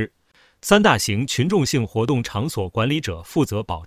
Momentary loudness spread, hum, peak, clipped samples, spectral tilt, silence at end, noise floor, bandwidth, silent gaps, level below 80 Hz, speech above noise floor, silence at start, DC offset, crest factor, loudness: 9 LU; none; 0 dBFS; under 0.1%; -5 dB/octave; 0 s; -58 dBFS; 16 kHz; none; -44 dBFS; 38 dB; 0 s; under 0.1%; 20 dB; -20 LUFS